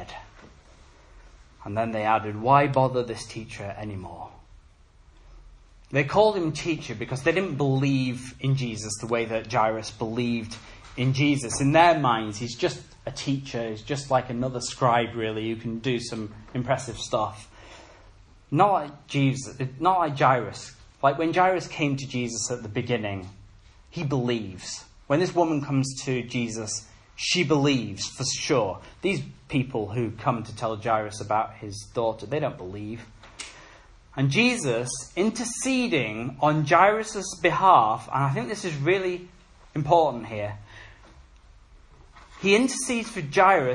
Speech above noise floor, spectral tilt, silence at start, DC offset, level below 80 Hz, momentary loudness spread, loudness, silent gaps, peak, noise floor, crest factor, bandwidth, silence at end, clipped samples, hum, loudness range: 29 dB; -5 dB/octave; 0 s; under 0.1%; -54 dBFS; 15 LU; -25 LUFS; none; -4 dBFS; -54 dBFS; 22 dB; 11.5 kHz; 0 s; under 0.1%; none; 6 LU